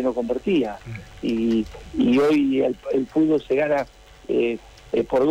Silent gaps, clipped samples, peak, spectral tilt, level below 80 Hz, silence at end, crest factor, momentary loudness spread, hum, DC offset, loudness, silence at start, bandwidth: none; under 0.1%; -12 dBFS; -7 dB/octave; -48 dBFS; 0 s; 10 dB; 12 LU; none; under 0.1%; -22 LUFS; 0 s; 11 kHz